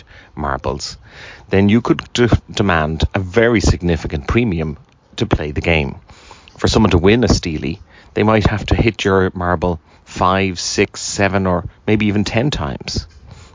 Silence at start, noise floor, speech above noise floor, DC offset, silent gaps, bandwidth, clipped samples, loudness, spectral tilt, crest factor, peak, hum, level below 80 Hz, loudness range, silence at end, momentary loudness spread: 0.15 s; -41 dBFS; 26 dB; under 0.1%; none; 7.6 kHz; under 0.1%; -17 LUFS; -5.5 dB/octave; 16 dB; 0 dBFS; none; -28 dBFS; 2 LU; 0.1 s; 12 LU